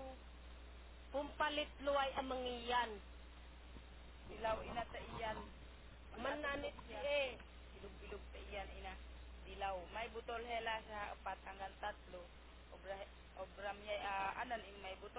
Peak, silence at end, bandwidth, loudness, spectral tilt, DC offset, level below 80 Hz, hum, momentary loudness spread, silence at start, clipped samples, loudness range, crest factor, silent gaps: -26 dBFS; 0 s; 4 kHz; -45 LUFS; -2 dB/octave; under 0.1%; -58 dBFS; none; 18 LU; 0 s; under 0.1%; 6 LU; 20 dB; none